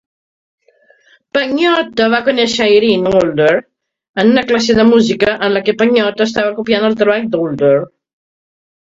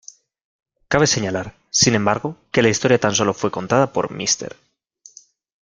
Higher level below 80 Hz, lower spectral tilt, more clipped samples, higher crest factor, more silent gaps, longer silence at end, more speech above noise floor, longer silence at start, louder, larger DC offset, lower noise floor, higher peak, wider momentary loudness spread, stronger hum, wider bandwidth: about the same, -50 dBFS vs -52 dBFS; first, -5 dB/octave vs -3.5 dB/octave; neither; about the same, 14 dB vs 18 dB; first, 4.09-4.14 s vs none; about the same, 1.1 s vs 1.15 s; first, 40 dB vs 32 dB; first, 1.35 s vs 0.9 s; first, -12 LUFS vs -18 LUFS; neither; about the same, -51 dBFS vs -51 dBFS; about the same, 0 dBFS vs -2 dBFS; second, 6 LU vs 9 LU; neither; second, 7.8 kHz vs 10.5 kHz